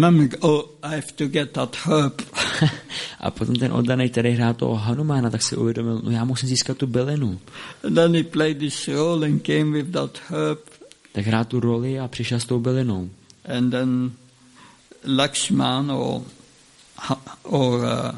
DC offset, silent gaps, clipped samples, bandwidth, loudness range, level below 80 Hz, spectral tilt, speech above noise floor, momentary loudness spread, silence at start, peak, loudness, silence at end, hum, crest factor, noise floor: under 0.1%; none; under 0.1%; 11.5 kHz; 3 LU; -56 dBFS; -5.5 dB/octave; 30 dB; 9 LU; 0 s; -4 dBFS; -22 LUFS; 0 s; none; 18 dB; -52 dBFS